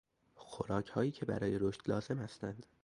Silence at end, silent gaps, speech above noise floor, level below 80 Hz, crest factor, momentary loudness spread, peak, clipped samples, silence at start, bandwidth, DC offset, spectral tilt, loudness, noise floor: 0.2 s; none; 20 dB; -64 dBFS; 18 dB; 10 LU; -20 dBFS; under 0.1%; 0.35 s; 11 kHz; under 0.1%; -7.5 dB/octave; -38 LUFS; -58 dBFS